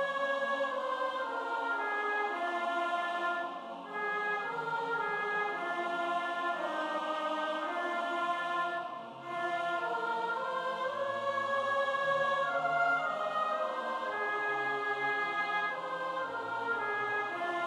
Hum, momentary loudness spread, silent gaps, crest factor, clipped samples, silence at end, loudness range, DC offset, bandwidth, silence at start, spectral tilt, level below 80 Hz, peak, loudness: none; 5 LU; none; 14 dB; under 0.1%; 0 s; 3 LU; under 0.1%; 12.5 kHz; 0 s; -3.5 dB/octave; -84 dBFS; -20 dBFS; -33 LUFS